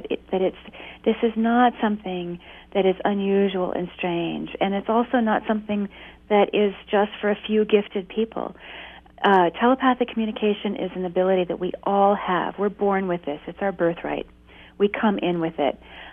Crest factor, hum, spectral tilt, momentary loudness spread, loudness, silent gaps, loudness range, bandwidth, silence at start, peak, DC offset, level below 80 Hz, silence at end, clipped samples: 18 dB; none; -9 dB/octave; 11 LU; -23 LUFS; none; 2 LU; 3.8 kHz; 0 s; -6 dBFS; under 0.1%; -54 dBFS; 0 s; under 0.1%